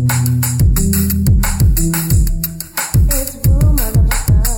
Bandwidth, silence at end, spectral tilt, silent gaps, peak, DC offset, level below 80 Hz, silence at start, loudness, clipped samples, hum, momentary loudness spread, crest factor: 19.5 kHz; 0 s; -5 dB/octave; none; -2 dBFS; under 0.1%; -16 dBFS; 0 s; -14 LUFS; under 0.1%; none; 3 LU; 10 dB